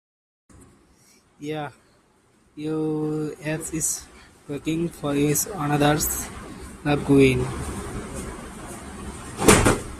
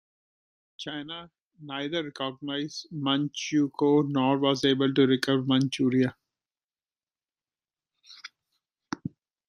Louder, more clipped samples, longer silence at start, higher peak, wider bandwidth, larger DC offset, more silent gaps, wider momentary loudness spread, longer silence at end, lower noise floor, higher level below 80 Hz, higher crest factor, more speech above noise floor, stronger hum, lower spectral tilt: first, -23 LUFS vs -26 LUFS; neither; second, 0.6 s vs 0.8 s; first, 0 dBFS vs -8 dBFS; first, 15.5 kHz vs 11 kHz; neither; second, none vs 1.41-1.47 s, 6.64-6.69 s; first, 20 LU vs 17 LU; second, 0 s vs 0.4 s; second, -60 dBFS vs under -90 dBFS; first, -40 dBFS vs -72 dBFS; about the same, 24 dB vs 22 dB; second, 37 dB vs over 64 dB; neither; about the same, -4.5 dB/octave vs -5.5 dB/octave